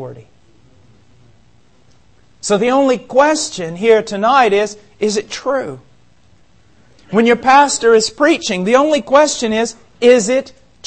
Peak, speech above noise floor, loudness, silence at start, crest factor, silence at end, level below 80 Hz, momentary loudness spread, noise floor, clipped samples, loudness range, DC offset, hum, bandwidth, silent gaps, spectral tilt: 0 dBFS; 39 dB; -13 LUFS; 0 s; 16 dB; 0 s; -54 dBFS; 10 LU; -52 dBFS; under 0.1%; 6 LU; 0.4%; none; 8.8 kHz; none; -3.5 dB/octave